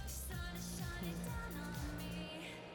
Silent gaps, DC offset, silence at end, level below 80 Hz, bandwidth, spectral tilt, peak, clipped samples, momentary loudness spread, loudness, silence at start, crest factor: none; under 0.1%; 0 s; -50 dBFS; 19.5 kHz; -4.5 dB/octave; -32 dBFS; under 0.1%; 2 LU; -45 LUFS; 0 s; 12 dB